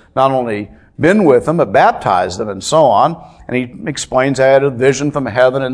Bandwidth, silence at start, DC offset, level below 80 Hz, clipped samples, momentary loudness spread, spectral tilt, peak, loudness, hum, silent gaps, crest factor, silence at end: 11 kHz; 0.15 s; under 0.1%; -46 dBFS; 0.2%; 11 LU; -5.5 dB/octave; 0 dBFS; -13 LUFS; none; none; 12 dB; 0 s